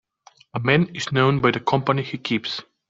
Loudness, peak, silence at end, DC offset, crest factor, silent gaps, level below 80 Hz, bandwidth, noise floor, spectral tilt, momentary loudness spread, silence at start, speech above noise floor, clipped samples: -21 LUFS; -2 dBFS; 0.25 s; under 0.1%; 20 dB; none; -56 dBFS; 7.8 kHz; -54 dBFS; -6 dB/octave; 7 LU; 0.55 s; 33 dB; under 0.1%